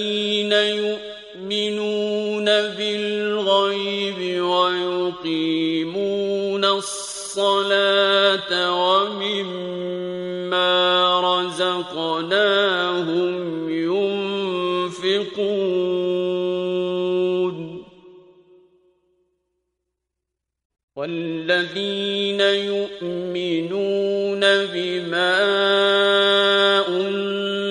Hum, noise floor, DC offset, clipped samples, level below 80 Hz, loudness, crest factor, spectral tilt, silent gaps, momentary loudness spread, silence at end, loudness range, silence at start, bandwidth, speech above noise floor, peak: none; -82 dBFS; under 0.1%; under 0.1%; -66 dBFS; -20 LUFS; 18 dB; -4 dB/octave; 20.65-20.70 s, 20.83-20.88 s; 10 LU; 0 s; 8 LU; 0 s; 11.5 kHz; 62 dB; -4 dBFS